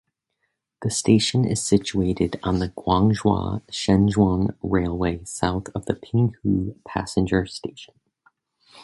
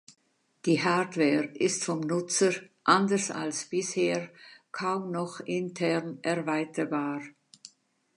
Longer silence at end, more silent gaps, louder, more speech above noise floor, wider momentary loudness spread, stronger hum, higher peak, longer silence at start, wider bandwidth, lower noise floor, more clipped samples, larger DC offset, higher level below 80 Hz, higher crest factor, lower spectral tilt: second, 0 s vs 0.5 s; neither; first, -22 LUFS vs -29 LUFS; first, 54 dB vs 36 dB; about the same, 10 LU vs 9 LU; neither; first, -4 dBFS vs -8 dBFS; first, 0.8 s vs 0.65 s; about the same, 11.5 kHz vs 11 kHz; first, -76 dBFS vs -64 dBFS; neither; neither; first, -40 dBFS vs -80 dBFS; about the same, 20 dB vs 22 dB; first, -5.5 dB/octave vs -4 dB/octave